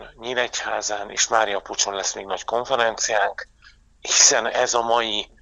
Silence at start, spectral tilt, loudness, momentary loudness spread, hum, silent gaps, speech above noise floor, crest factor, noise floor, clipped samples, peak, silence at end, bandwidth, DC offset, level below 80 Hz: 0 s; 0.5 dB/octave; -20 LUFS; 12 LU; none; none; 31 dB; 22 dB; -53 dBFS; under 0.1%; 0 dBFS; 0.15 s; 15 kHz; under 0.1%; -56 dBFS